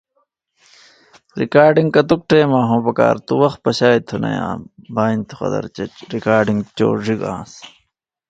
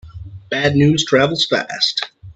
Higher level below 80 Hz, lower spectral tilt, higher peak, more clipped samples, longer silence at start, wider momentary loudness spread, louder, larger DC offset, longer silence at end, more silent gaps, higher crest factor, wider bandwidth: second, -52 dBFS vs -46 dBFS; first, -7 dB/octave vs -4.5 dB/octave; about the same, 0 dBFS vs 0 dBFS; neither; first, 1.35 s vs 0.05 s; about the same, 13 LU vs 12 LU; about the same, -16 LUFS vs -16 LUFS; neither; first, 0.6 s vs 0.05 s; neither; about the same, 18 dB vs 16 dB; about the same, 9 kHz vs 8.4 kHz